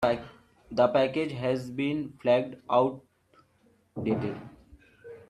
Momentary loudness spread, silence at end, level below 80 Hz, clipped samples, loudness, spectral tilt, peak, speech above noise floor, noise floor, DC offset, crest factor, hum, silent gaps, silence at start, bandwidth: 19 LU; 0.1 s; -62 dBFS; under 0.1%; -28 LUFS; -7.5 dB/octave; -10 dBFS; 38 dB; -65 dBFS; under 0.1%; 20 dB; none; none; 0 s; 11.5 kHz